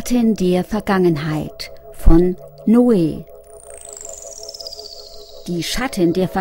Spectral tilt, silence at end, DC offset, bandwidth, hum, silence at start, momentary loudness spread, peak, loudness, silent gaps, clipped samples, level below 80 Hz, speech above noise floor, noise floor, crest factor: -6 dB/octave; 0 s; under 0.1%; 16.5 kHz; none; 0 s; 19 LU; 0 dBFS; -17 LUFS; none; under 0.1%; -24 dBFS; 23 dB; -38 dBFS; 18 dB